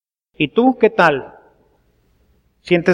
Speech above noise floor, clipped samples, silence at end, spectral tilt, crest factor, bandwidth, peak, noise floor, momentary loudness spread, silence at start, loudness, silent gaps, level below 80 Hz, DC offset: 44 dB; under 0.1%; 0 s; -7 dB/octave; 18 dB; 10.5 kHz; 0 dBFS; -59 dBFS; 8 LU; 0.4 s; -16 LUFS; none; -56 dBFS; under 0.1%